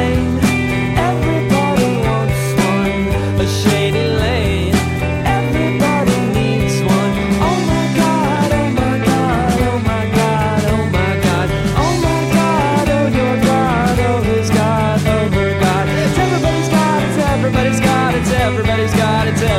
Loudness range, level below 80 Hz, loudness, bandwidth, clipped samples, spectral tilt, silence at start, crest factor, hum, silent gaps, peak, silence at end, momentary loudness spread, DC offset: 1 LU; -28 dBFS; -15 LUFS; 16.5 kHz; under 0.1%; -6 dB/octave; 0 s; 14 dB; none; none; 0 dBFS; 0 s; 2 LU; under 0.1%